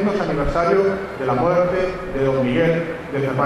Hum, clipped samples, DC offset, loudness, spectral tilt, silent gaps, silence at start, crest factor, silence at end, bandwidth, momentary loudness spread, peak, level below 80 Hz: none; under 0.1%; under 0.1%; -20 LUFS; -7.5 dB/octave; none; 0 s; 16 dB; 0 s; 12.5 kHz; 7 LU; -4 dBFS; -36 dBFS